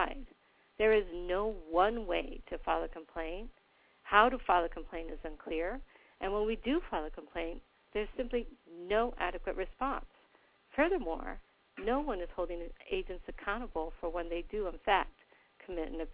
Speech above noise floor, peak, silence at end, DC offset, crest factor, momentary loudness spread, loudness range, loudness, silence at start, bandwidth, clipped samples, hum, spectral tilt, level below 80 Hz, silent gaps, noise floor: 33 dB; -10 dBFS; 0 s; under 0.1%; 26 dB; 15 LU; 5 LU; -35 LUFS; 0 s; 4 kHz; under 0.1%; none; -2 dB/octave; -50 dBFS; none; -67 dBFS